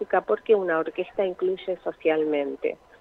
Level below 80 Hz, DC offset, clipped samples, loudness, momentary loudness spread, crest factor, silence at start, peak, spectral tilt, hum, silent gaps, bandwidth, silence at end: -66 dBFS; under 0.1%; under 0.1%; -26 LUFS; 8 LU; 16 dB; 0 s; -8 dBFS; -7.5 dB/octave; none; none; 4.3 kHz; 0.25 s